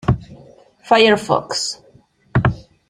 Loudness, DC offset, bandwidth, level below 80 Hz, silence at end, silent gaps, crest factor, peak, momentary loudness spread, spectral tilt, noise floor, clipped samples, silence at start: -17 LUFS; under 0.1%; 12.5 kHz; -38 dBFS; 0.3 s; none; 18 dB; 0 dBFS; 12 LU; -5 dB/octave; -52 dBFS; under 0.1%; 0.05 s